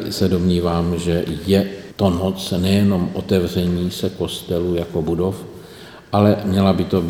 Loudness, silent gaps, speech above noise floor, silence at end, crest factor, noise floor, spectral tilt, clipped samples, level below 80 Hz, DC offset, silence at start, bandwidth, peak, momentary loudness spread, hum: -19 LUFS; none; 21 dB; 0 s; 18 dB; -39 dBFS; -7 dB/octave; under 0.1%; -40 dBFS; under 0.1%; 0 s; 16.5 kHz; 0 dBFS; 8 LU; none